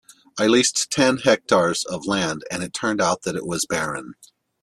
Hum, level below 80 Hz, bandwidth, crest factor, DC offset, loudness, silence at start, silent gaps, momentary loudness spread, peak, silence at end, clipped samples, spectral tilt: none; -58 dBFS; 13.5 kHz; 20 dB; under 0.1%; -21 LUFS; 0.35 s; none; 11 LU; -2 dBFS; 0.5 s; under 0.1%; -3 dB/octave